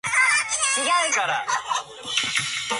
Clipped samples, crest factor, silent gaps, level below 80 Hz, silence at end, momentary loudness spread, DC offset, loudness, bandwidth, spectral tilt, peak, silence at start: under 0.1%; 16 dB; none; -64 dBFS; 0 s; 8 LU; under 0.1%; -21 LUFS; 12 kHz; 0.5 dB/octave; -8 dBFS; 0.05 s